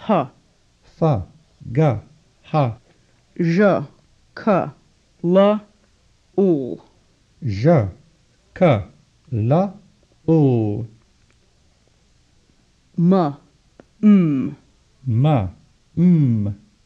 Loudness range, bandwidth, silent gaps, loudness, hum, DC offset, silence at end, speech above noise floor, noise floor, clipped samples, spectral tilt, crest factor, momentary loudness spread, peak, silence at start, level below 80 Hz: 4 LU; 6.8 kHz; none; -19 LUFS; none; under 0.1%; 0.3 s; 41 dB; -58 dBFS; under 0.1%; -9.5 dB/octave; 18 dB; 16 LU; -4 dBFS; 0 s; -52 dBFS